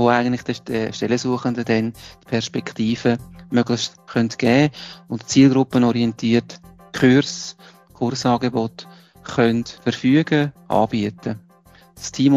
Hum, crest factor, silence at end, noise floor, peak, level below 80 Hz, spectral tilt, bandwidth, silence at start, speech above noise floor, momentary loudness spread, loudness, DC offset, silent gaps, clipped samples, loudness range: none; 18 dB; 0 s; -51 dBFS; -2 dBFS; -54 dBFS; -5.5 dB/octave; 12.5 kHz; 0 s; 31 dB; 15 LU; -20 LUFS; under 0.1%; none; under 0.1%; 4 LU